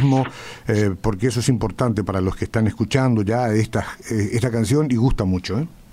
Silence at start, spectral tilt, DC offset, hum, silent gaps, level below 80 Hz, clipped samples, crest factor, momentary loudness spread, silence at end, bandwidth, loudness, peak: 0 s; -6.5 dB/octave; under 0.1%; none; none; -36 dBFS; under 0.1%; 16 dB; 6 LU; 0.1 s; 15 kHz; -21 LUFS; -4 dBFS